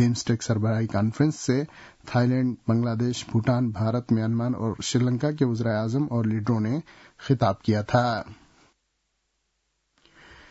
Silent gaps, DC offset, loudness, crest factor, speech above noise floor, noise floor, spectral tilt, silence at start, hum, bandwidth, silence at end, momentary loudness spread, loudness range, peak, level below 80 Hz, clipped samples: none; under 0.1%; -25 LUFS; 18 dB; 51 dB; -75 dBFS; -6.5 dB/octave; 0 s; none; 8 kHz; 2.15 s; 5 LU; 3 LU; -8 dBFS; -58 dBFS; under 0.1%